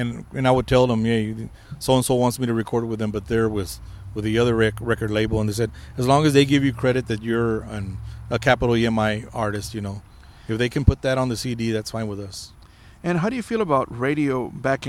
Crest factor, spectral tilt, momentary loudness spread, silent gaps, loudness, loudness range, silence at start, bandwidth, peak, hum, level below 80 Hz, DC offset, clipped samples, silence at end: 22 dB; -6 dB/octave; 13 LU; none; -22 LUFS; 4 LU; 0 s; 15.5 kHz; 0 dBFS; none; -38 dBFS; under 0.1%; under 0.1%; 0 s